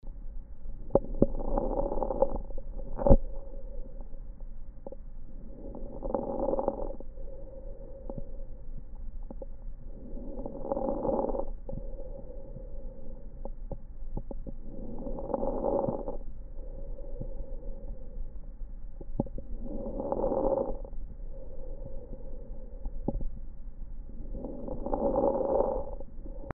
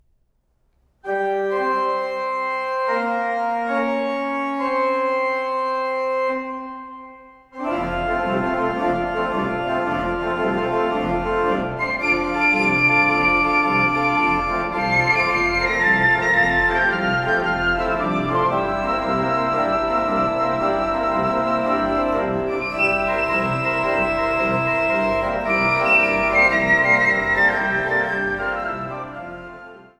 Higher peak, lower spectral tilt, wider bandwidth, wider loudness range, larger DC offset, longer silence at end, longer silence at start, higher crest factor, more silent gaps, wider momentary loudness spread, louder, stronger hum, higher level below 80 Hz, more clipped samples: about the same, -4 dBFS vs -4 dBFS; first, -8.5 dB/octave vs -6 dB/octave; second, 1.7 kHz vs 12.5 kHz; first, 11 LU vs 7 LU; neither; second, 0 s vs 0.2 s; second, 0.05 s vs 1.05 s; first, 28 dB vs 16 dB; neither; first, 19 LU vs 8 LU; second, -34 LUFS vs -19 LUFS; neither; first, -36 dBFS vs -42 dBFS; neither